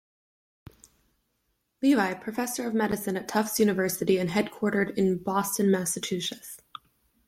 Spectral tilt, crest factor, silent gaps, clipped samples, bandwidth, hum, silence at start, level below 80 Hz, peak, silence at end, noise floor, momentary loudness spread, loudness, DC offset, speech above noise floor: -4.5 dB/octave; 18 dB; none; under 0.1%; 16.5 kHz; none; 1.8 s; -64 dBFS; -10 dBFS; 0.7 s; -76 dBFS; 9 LU; -27 LUFS; under 0.1%; 50 dB